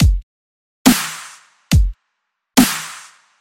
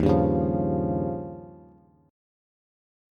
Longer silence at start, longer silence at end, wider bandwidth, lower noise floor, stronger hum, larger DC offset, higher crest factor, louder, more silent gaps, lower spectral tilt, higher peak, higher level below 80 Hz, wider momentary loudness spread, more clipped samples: about the same, 0 s vs 0 s; second, 0.4 s vs 1.5 s; first, 17 kHz vs 6.6 kHz; first, -74 dBFS vs -55 dBFS; neither; neither; about the same, 18 dB vs 18 dB; first, -17 LUFS vs -26 LUFS; first, 0.23-0.85 s vs none; second, -4.5 dB/octave vs -10.5 dB/octave; first, 0 dBFS vs -8 dBFS; first, -24 dBFS vs -42 dBFS; second, 17 LU vs 20 LU; neither